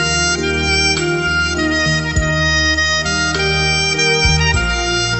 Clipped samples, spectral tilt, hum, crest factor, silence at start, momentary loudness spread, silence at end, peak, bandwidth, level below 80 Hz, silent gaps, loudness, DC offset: under 0.1%; -3 dB/octave; none; 14 dB; 0 s; 4 LU; 0 s; 0 dBFS; 8.4 kHz; -26 dBFS; none; -14 LUFS; under 0.1%